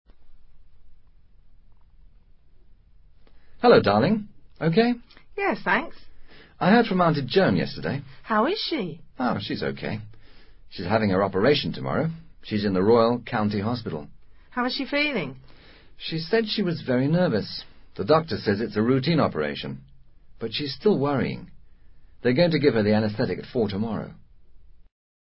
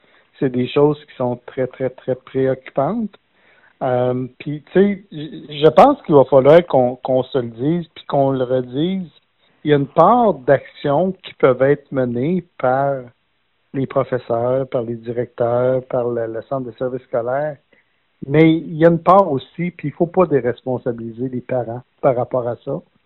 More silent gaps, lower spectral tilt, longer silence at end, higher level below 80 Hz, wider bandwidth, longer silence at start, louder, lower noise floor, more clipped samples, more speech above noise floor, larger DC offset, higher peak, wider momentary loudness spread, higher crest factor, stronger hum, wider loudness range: neither; first, -10.5 dB/octave vs -6.5 dB/octave; first, 0.5 s vs 0.25 s; about the same, -52 dBFS vs -54 dBFS; first, 5.8 kHz vs 4.6 kHz; second, 0.15 s vs 0.4 s; second, -24 LUFS vs -18 LUFS; second, -51 dBFS vs -67 dBFS; neither; second, 28 dB vs 50 dB; neither; second, -4 dBFS vs 0 dBFS; about the same, 15 LU vs 14 LU; about the same, 22 dB vs 18 dB; neither; second, 4 LU vs 7 LU